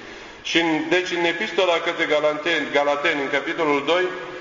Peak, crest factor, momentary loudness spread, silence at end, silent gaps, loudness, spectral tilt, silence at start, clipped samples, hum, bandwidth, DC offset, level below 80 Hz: -2 dBFS; 18 dB; 3 LU; 0 s; none; -21 LUFS; -3.5 dB/octave; 0 s; under 0.1%; none; 7.6 kHz; under 0.1%; -60 dBFS